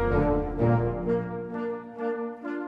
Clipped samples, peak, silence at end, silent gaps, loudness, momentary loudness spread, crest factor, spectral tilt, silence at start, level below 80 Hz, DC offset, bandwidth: under 0.1%; -10 dBFS; 0 s; none; -28 LUFS; 9 LU; 16 dB; -10.5 dB/octave; 0 s; -38 dBFS; under 0.1%; 5 kHz